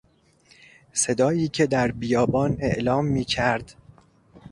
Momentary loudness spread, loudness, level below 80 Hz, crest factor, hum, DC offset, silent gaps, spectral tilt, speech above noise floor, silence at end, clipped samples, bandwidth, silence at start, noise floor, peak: 3 LU; -23 LUFS; -48 dBFS; 18 dB; none; under 0.1%; none; -5 dB/octave; 36 dB; 0.05 s; under 0.1%; 11.5 kHz; 0.95 s; -58 dBFS; -6 dBFS